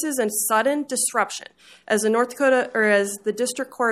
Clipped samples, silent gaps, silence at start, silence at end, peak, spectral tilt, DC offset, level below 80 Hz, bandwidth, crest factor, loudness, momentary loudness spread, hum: under 0.1%; none; 0 s; 0 s; -6 dBFS; -2.5 dB/octave; under 0.1%; -72 dBFS; 15.5 kHz; 16 dB; -21 LUFS; 7 LU; none